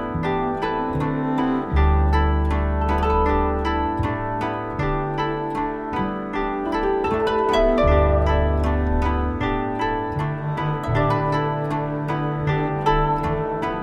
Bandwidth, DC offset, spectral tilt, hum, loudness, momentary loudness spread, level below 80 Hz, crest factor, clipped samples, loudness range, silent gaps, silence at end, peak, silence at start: 8 kHz; under 0.1%; -8 dB/octave; none; -22 LUFS; 7 LU; -26 dBFS; 14 dB; under 0.1%; 4 LU; none; 0 s; -6 dBFS; 0 s